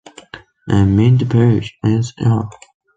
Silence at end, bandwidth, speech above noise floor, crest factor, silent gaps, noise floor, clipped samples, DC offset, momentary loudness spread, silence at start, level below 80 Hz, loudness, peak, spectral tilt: 0.45 s; 7.8 kHz; 25 dB; 14 dB; none; -39 dBFS; under 0.1%; under 0.1%; 15 LU; 0.35 s; -36 dBFS; -15 LUFS; -2 dBFS; -8 dB/octave